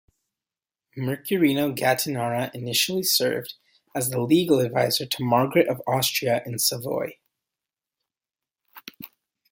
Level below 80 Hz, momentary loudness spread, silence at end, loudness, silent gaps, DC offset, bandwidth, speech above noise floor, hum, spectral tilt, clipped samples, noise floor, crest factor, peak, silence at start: -66 dBFS; 19 LU; 0.45 s; -23 LUFS; none; under 0.1%; 17 kHz; over 67 dB; none; -4 dB/octave; under 0.1%; under -90 dBFS; 20 dB; -4 dBFS; 0.95 s